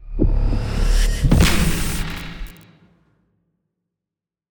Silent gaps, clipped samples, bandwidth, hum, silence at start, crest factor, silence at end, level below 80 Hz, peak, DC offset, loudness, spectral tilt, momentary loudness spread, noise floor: none; under 0.1%; over 20 kHz; none; 0 s; 18 dB; 2 s; -22 dBFS; -2 dBFS; under 0.1%; -20 LUFS; -5 dB/octave; 17 LU; -87 dBFS